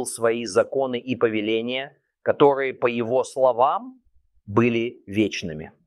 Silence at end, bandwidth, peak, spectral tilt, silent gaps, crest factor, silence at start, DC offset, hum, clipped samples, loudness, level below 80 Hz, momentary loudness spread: 0.15 s; 13 kHz; -2 dBFS; -5 dB/octave; none; 20 dB; 0 s; under 0.1%; none; under 0.1%; -23 LUFS; -62 dBFS; 11 LU